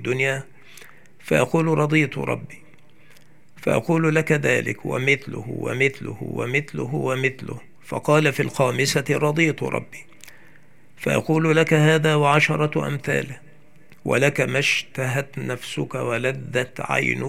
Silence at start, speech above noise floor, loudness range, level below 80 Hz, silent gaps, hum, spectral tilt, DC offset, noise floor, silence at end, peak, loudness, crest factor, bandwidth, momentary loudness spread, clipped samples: 0 s; 33 dB; 4 LU; -62 dBFS; none; none; -5.5 dB/octave; 0.6%; -54 dBFS; 0 s; -2 dBFS; -21 LUFS; 20 dB; 16 kHz; 13 LU; under 0.1%